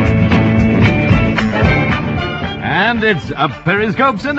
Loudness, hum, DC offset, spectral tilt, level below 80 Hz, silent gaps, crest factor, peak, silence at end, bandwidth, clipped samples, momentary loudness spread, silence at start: -13 LUFS; none; under 0.1%; -7.5 dB/octave; -28 dBFS; none; 12 dB; 0 dBFS; 0 s; 7.8 kHz; under 0.1%; 7 LU; 0 s